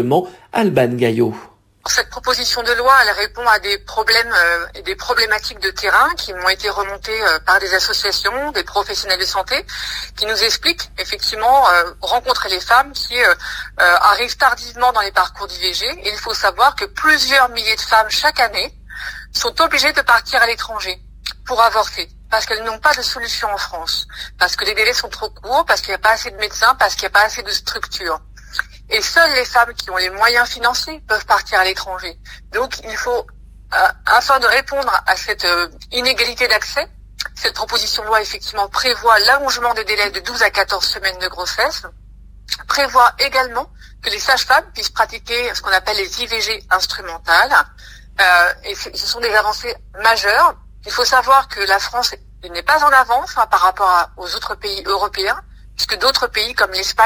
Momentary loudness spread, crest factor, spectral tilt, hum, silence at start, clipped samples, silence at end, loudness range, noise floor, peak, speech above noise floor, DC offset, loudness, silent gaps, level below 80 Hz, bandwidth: 11 LU; 16 dB; -1.5 dB/octave; none; 0 s; under 0.1%; 0 s; 3 LU; -38 dBFS; 0 dBFS; 21 dB; under 0.1%; -15 LUFS; none; -40 dBFS; 16 kHz